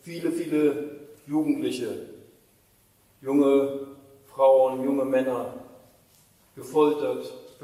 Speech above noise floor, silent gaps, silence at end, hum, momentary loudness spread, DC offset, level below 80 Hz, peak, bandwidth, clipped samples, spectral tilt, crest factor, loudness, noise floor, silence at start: 38 dB; none; 0.15 s; none; 21 LU; under 0.1%; -72 dBFS; -8 dBFS; 15 kHz; under 0.1%; -6 dB/octave; 18 dB; -24 LUFS; -62 dBFS; 0.05 s